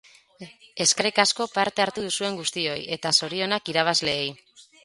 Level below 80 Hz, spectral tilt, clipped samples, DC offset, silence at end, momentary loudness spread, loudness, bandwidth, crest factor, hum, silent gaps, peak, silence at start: -66 dBFS; -1.5 dB/octave; under 0.1%; under 0.1%; 0.2 s; 7 LU; -23 LUFS; 11.5 kHz; 24 dB; none; none; -2 dBFS; 0.4 s